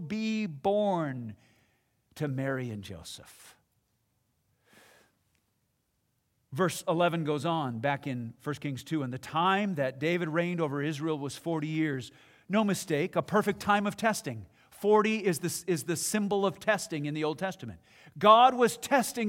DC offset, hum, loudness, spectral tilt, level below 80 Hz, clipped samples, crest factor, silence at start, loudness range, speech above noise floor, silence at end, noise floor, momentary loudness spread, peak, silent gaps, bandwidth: under 0.1%; none; -29 LUFS; -5 dB/octave; -72 dBFS; under 0.1%; 22 dB; 0 s; 12 LU; 47 dB; 0 s; -76 dBFS; 12 LU; -8 dBFS; none; 16.5 kHz